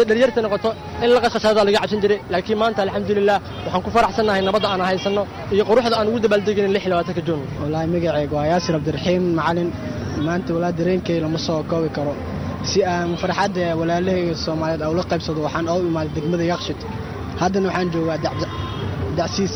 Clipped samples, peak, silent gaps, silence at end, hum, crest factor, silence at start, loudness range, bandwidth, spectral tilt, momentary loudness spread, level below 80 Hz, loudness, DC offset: under 0.1%; -6 dBFS; none; 0 s; none; 14 dB; 0 s; 4 LU; over 20 kHz; -6 dB/octave; 8 LU; -42 dBFS; -20 LUFS; under 0.1%